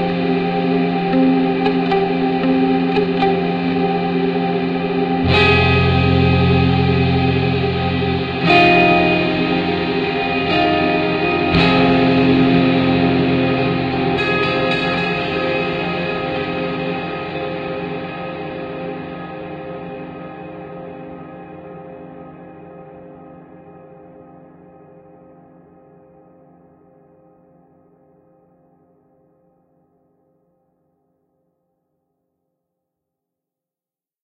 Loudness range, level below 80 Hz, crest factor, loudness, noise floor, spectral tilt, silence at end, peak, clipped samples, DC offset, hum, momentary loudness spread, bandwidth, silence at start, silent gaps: 18 LU; -40 dBFS; 18 dB; -16 LUFS; under -90 dBFS; -8 dB/octave; 9.85 s; 0 dBFS; under 0.1%; under 0.1%; none; 19 LU; 7.2 kHz; 0 s; none